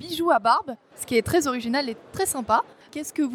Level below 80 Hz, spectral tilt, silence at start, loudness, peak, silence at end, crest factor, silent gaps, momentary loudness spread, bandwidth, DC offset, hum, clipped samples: -56 dBFS; -3.5 dB/octave; 0 s; -24 LUFS; -6 dBFS; 0 s; 18 dB; none; 14 LU; 19 kHz; under 0.1%; none; under 0.1%